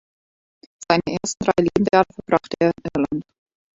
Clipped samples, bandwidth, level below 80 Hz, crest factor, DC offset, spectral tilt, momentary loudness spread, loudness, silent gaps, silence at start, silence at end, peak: under 0.1%; 8 kHz; -50 dBFS; 22 dB; under 0.1%; -5 dB/octave; 7 LU; -21 LUFS; none; 0.8 s; 0.55 s; 0 dBFS